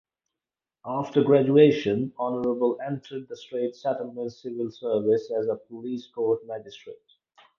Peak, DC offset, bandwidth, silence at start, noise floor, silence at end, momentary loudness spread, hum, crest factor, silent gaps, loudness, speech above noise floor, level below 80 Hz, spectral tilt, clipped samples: -4 dBFS; under 0.1%; 6.8 kHz; 0.85 s; -90 dBFS; 0.65 s; 18 LU; none; 22 dB; none; -25 LUFS; 65 dB; -70 dBFS; -8 dB/octave; under 0.1%